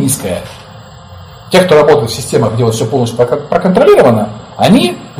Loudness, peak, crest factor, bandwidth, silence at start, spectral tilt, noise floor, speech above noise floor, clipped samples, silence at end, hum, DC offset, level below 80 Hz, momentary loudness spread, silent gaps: -10 LUFS; 0 dBFS; 10 dB; 16 kHz; 0 s; -5.5 dB/octave; -33 dBFS; 23 dB; 0.6%; 0 s; none; under 0.1%; -40 dBFS; 9 LU; none